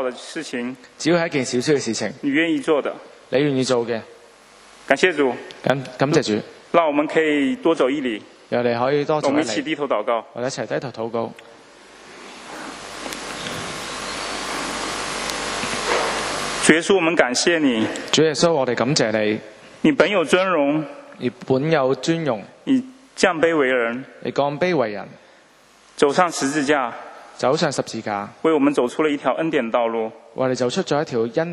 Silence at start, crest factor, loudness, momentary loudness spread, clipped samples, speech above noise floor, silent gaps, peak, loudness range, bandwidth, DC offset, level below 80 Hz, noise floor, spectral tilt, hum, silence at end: 0 s; 22 dB; -21 LUFS; 11 LU; under 0.1%; 32 dB; none; 0 dBFS; 8 LU; 13 kHz; under 0.1%; -56 dBFS; -52 dBFS; -4 dB/octave; none; 0 s